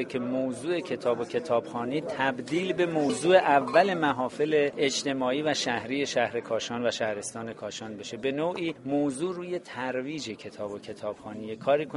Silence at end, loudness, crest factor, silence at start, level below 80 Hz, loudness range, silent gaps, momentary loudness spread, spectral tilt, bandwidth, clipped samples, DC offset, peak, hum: 0 s; -28 LUFS; 22 dB; 0 s; -68 dBFS; 7 LU; none; 14 LU; -4.5 dB/octave; 11.5 kHz; under 0.1%; under 0.1%; -6 dBFS; none